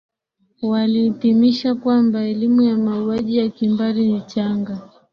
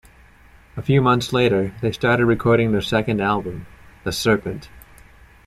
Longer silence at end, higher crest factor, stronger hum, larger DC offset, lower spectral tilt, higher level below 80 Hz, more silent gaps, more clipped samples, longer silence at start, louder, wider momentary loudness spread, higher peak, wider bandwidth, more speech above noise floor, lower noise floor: second, 0.3 s vs 0.65 s; about the same, 14 dB vs 18 dB; neither; neither; first, -8 dB/octave vs -6 dB/octave; second, -60 dBFS vs -44 dBFS; neither; neither; second, 0.6 s vs 0.75 s; about the same, -18 LUFS vs -19 LUFS; second, 7 LU vs 15 LU; about the same, -4 dBFS vs -4 dBFS; second, 6.4 kHz vs 15 kHz; first, 48 dB vs 30 dB; first, -66 dBFS vs -49 dBFS